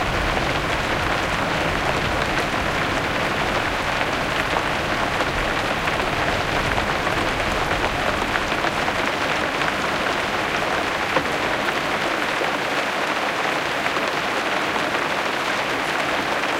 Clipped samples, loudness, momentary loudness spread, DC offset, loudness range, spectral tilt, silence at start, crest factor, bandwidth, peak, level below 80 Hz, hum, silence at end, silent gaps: under 0.1%; -21 LUFS; 1 LU; under 0.1%; 0 LU; -3.5 dB/octave; 0 s; 20 dB; 17 kHz; -2 dBFS; -38 dBFS; none; 0 s; none